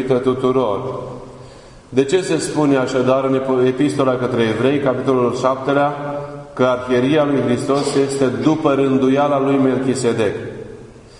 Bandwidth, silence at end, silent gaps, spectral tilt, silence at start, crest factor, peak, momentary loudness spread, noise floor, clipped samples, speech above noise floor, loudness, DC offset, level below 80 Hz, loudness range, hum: 11 kHz; 0 s; none; -6 dB/octave; 0 s; 16 dB; 0 dBFS; 11 LU; -40 dBFS; under 0.1%; 24 dB; -17 LUFS; under 0.1%; -50 dBFS; 2 LU; none